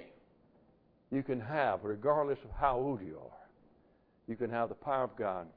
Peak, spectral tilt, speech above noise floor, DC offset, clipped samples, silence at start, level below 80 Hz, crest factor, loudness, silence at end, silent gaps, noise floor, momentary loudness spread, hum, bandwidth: -16 dBFS; -6 dB/octave; 34 dB; under 0.1%; under 0.1%; 0 s; -58 dBFS; 22 dB; -35 LUFS; 0.05 s; none; -68 dBFS; 15 LU; none; 5 kHz